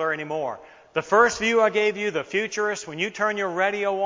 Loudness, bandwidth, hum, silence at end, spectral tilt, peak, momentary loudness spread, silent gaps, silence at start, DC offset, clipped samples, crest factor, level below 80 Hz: -23 LUFS; 7.6 kHz; none; 0 s; -3.5 dB/octave; -6 dBFS; 11 LU; none; 0 s; under 0.1%; under 0.1%; 18 dB; -62 dBFS